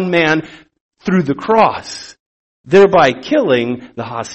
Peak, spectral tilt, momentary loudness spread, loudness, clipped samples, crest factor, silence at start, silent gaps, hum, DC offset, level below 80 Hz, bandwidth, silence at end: 0 dBFS; -6 dB/octave; 16 LU; -13 LUFS; under 0.1%; 14 dB; 0 s; 0.80-0.91 s, 2.20-2.64 s; none; under 0.1%; -52 dBFS; 8.6 kHz; 0 s